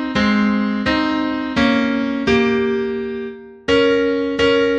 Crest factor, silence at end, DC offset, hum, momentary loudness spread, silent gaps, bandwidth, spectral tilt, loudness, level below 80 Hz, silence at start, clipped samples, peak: 14 dB; 0 s; under 0.1%; none; 8 LU; none; 8.6 kHz; -5.5 dB/octave; -17 LUFS; -42 dBFS; 0 s; under 0.1%; -4 dBFS